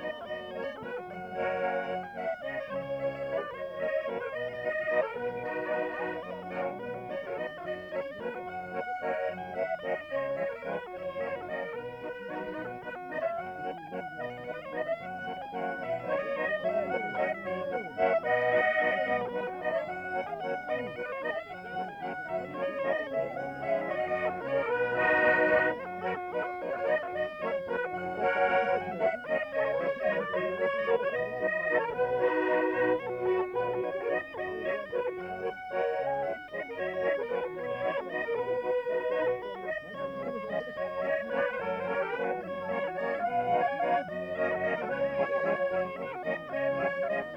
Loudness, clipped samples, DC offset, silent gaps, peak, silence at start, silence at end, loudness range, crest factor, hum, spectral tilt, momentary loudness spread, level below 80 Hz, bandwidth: -32 LUFS; under 0.1%; under 0.1%; none; -14 dBFS; 0 s; 0 s; 7 LU; 18 dB; none; -6.5 dB/octave; 10 LU; -66 dBFS; 7.8 kHz